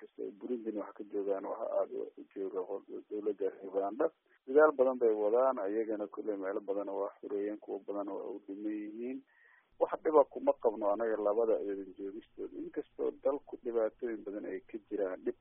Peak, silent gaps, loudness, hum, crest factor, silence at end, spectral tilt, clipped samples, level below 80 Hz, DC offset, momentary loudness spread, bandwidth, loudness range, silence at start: -14 dBFS; none; -35 LUFS; none; 22 dB; 0.1 s; -1 dB/octave; under 0.1%; -76 dBFS; under 0.1%; 14 LU; 3.6 kHz; 8 LU; 0 s